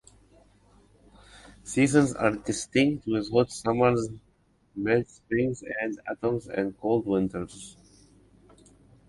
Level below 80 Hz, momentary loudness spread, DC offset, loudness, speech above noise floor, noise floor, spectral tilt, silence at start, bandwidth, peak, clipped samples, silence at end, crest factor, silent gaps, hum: -56 dBFS; 15 LU; under 0.1%; -27 LUFS; 38 dB; -64 dBFS; -5.5 dB/octave; 1.35 s; 11.5 kHz; -6 dBFS; under 0.1%; 1.35 s; 22 dB; none; none